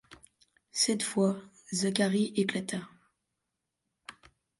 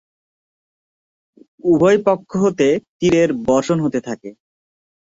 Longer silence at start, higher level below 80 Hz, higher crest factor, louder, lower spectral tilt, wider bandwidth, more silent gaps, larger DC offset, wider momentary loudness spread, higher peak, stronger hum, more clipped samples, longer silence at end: second, 0.1 s vs 1.65 s; second, -74 dBFS vs -52 dBFS; first, 22 dB vs 16 dB; second, -30 LUFS vs -17 LUFS; second, -4 dB/octave vs -6.5 dB/octave; first, 11.5 kHz vs 7.8 kHz; second, none vs 2.88-2.99 s; neither; first, 22 LU vs 10 LU; second, -12 dBFS vs -2 dBFS; neither; neither; second, 0.5 s vs 0.8 s